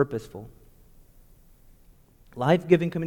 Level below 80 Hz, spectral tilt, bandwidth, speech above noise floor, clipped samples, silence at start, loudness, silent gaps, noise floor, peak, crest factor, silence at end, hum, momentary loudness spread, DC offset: -54 dBFS; -8 dB/octave; 18 kHz; 31 dB; under 0.1%; 0 s; -24 LUFS; none; -56 dBFS; -4 dBFS; 22 dB; 0 s; none; 25 LU; under 0.1%